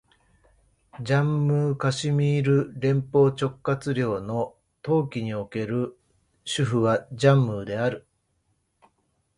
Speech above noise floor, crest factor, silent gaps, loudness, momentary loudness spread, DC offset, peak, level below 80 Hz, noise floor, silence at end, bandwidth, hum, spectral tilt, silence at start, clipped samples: 48 dB; 20 dB; none; -24 LUFS; 10 LU; under 0.1%; -6 dBFS; -58 dBFS; -71 dBFS; 1.4 s; 11 kHz; none; -7 dB/octave; 0.95 s; under 0.1%